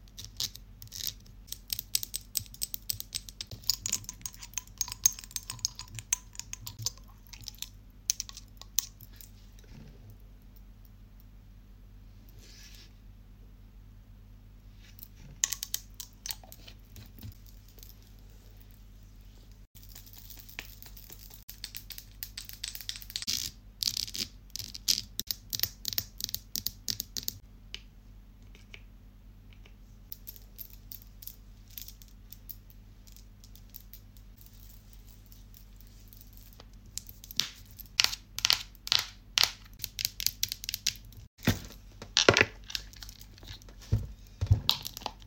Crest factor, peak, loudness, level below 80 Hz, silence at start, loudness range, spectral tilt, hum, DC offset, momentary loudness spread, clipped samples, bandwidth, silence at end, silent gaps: 36 dB; -2 dBFS; -32 LUFS; -50 dBFS; 0 s; 23 LU; -2 dB/octave; none; under 0.1%; 26 LU; under 0.1%; 17 kHz; 0 s; 19.67-19.75 s, 21.43-21.48 s, 41.27-41.37 s